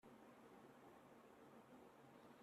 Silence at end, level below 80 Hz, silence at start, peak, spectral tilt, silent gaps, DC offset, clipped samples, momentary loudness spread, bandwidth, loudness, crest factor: 0 s; under -90 dBFS; 0.05 s; -52 dBFS; -5.5 dB/octave; none; under 0.1%; under 0.1%; 1 LU; 13 kHz; -66 LUFS; 14 dB